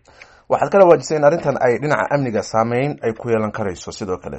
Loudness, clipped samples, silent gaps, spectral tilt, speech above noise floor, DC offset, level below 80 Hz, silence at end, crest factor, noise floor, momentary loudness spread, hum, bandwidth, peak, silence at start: -17 LUFS; under 0.1%; none; -6 dB/octave; 29 dB; under 0.1%; -52 dBFS; 0 s; 18 dB; -46 dBFS; 13 LU; none; 8.4 kHz; 0 dBFS; 0.5 s